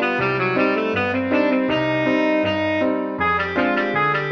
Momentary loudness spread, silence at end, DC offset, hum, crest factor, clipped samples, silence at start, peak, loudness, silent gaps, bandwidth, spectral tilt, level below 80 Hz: 2 LU; 0 s; under 0.1%; none; 14 dB; under 0.1%; 0 s; -6 dBFS; -19 LUFS; none; 6.8 kHz; -7 dB/octave; -52 dBFS